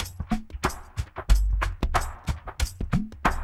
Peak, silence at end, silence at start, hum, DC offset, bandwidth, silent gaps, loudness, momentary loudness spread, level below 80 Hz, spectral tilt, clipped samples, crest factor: -6 dBFS; 0 s; 0 s; none; under 0.1%; 15 kHz; none; -29 LUFS; 9 LU; -28 dBFS; -5 dB/octave; under 0.1%; 20 dB